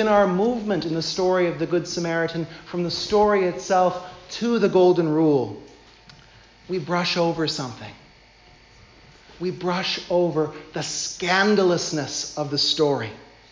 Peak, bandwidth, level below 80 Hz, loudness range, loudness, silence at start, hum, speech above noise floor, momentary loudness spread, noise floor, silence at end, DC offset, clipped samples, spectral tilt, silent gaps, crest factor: -6 dBFS; 7.6 kHz; -56 dBFS; 7 LU; -22 LUFS; 0 s; none; 30 dB; 12 LU; -51 dBFS; 0.3 s; under 0.1%; under 0.1%; -4.5 dB/octave; none; 16 dB